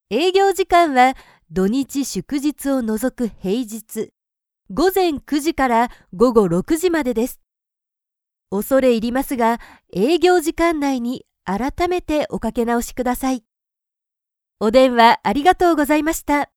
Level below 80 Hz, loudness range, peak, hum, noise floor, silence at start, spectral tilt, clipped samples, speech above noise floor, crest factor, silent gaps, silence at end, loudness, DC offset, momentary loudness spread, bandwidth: -42 dBFS; 5 LU; 0 dBFS; none; -81 dBFS; 0.1 s; -4.5 dB/octave; under 0.1%; 64 dB; 18 dB; none; 0.1 s; -18 LUFS; under 0.1%; 12 LU; 19.5 kHz